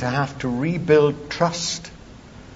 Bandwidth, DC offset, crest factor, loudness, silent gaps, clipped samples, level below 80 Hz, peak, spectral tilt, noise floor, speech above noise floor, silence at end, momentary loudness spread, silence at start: 8 kHz; under 0.1%; 18 dB; -21 LUFS; none; under 0.1%; -48 dBFS; -4 dBFS; -5 dB/octave; -42 dBFS; 21 dB; 0 s; 10 LU; 0 s